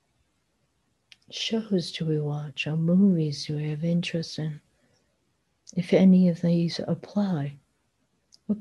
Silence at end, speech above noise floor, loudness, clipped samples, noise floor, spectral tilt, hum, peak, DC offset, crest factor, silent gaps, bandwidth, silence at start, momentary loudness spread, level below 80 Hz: 0 s; 48 dB; -25 LUFS; under 0.1%; -73 dBFS; -7 dB/octave; none; -8 dBFS; under 0.1%; 18 dB; none; 10.5 kHz; 1.3 s; 14 LU; -66 dBFS